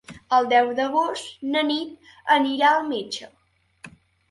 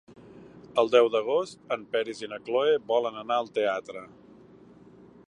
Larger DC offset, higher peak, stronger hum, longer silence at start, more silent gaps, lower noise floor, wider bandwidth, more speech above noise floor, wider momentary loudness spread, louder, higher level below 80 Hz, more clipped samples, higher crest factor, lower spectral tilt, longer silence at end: neither; about the same, -6 dBFS vs -6 dBFS; neither; second, 0.1 s vs 0.35 s; neither; about the same, -50 dBFS vs -52 dBFS; first, 11.5 kHz vs 10 kHz; about the same, 28 dB vs 26 dB; about the same, 14 LU vs 13 LU; first, -22 LUFS vs -27 LUFS; first, -66 dBFS vs -72 dBFS; neither; about the same, 18 dB vs 22 dB; second, -3 dB/octave vs -4.5 dB/octave; second, 0.4 s vs 1.2 s